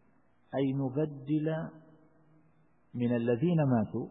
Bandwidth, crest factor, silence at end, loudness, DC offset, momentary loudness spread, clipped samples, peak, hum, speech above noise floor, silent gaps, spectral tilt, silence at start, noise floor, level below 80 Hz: 4 kHz; 16 dB; 0 s; -31 LUFS; under 0.1%; 10 LU; under 0.1%; -18 dBFS; none; 39 dB; none; -12 dB/octave; 0.5 s; -69 dBFS; -70 dBFS